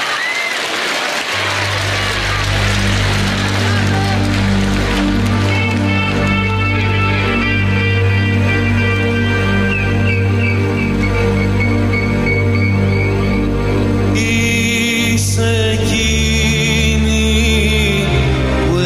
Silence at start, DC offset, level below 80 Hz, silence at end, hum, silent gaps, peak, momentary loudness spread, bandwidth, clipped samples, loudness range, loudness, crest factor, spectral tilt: 0 s; under 0.1%; -24 dBFS; 0 s; none; none; -2 dBFS; 3 LU; 14.5 kHz; under 0.1%; 1 LU; -14 LUFS; 12 dB; -5 dB/octave